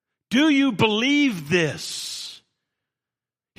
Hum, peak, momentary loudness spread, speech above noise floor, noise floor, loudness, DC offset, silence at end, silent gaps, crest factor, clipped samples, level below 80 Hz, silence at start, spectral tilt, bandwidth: none; -4 dBFS; 12 LU; over 70 dB; under -90 dBFS; -21 LUFS; under 0.1%; 1.25 s; none; 20 dB; under 0.1%; -64 dBFS; 0.3 s; -4 dB/octave; 15.5 kHz